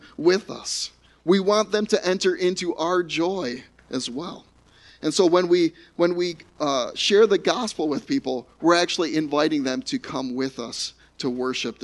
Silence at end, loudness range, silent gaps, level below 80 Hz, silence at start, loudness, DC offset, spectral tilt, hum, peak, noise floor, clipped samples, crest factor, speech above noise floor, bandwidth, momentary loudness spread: 0.1 s; 3 LU; none; -62 dBFS; 0.05 s; -23 LUFS; under 0.1%; -4 dB/octave; none; -6 dBFS; -53 dBFS; under 0.1%; 18 dB; 30 dB; 11.5 kHz; 11 LU